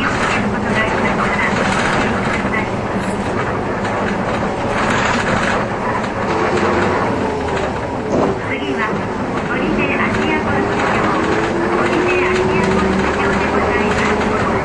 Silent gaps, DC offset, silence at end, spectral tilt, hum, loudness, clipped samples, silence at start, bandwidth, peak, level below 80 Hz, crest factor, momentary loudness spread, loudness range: none; under 0.1%; 0 s; -5.5 dB/octave; none; -17 LUFS; under 0.1%; 0 s; 11 kHz; -2 dBFS; -34 dBFS; 14 dB; 4 LU; 3 LU